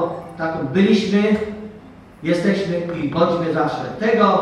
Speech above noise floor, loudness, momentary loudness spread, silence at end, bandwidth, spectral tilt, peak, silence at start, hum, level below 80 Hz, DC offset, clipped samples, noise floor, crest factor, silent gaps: 24 dB; -19 LUFS; 11 LU; 0 s; 10.5 kHz; -7 dB/octave; -2 dBFS; 0 s; none; -52 dBFS; under 0.1%; under 0.1%; -41 dBFS; 18 dB; none